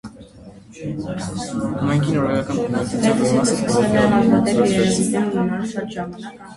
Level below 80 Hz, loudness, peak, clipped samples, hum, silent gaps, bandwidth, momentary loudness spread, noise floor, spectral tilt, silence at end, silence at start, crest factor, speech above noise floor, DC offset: -46 dBFS; -19 LUFS; -2 dBFS; under 0.1%; none; none; 11.5 kHz; 13 LU; -42 dBFS; -5.5 dB/octave; 0 s; 0.05 s; 18 dB; 23 dB; under 0.1%